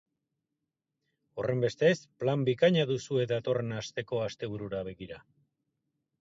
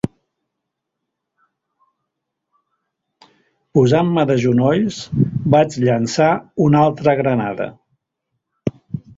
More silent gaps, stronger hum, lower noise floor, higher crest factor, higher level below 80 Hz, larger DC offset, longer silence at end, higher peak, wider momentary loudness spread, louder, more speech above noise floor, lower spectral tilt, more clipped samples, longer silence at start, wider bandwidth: neither; neither; first, -86 dBFS vs -79 dBFS; about the same, 20 dB vs 18 dB; second, -66 dBFS vs -52 dBFS; neither; first, 1 s vs 0.2 s; second, -12 dBFS vs -2 dBFS; about the same, 15 LU vs 13 LU; second, -30 LUFS vs -17 LUFS; second, 56 dB vs 63 dB; about the same, -6 dB/octave vs -7 dB/octave; neither; first, 1.35 s vs 0.05 s; about the same, 7.8 kHz vs 7.8 kHz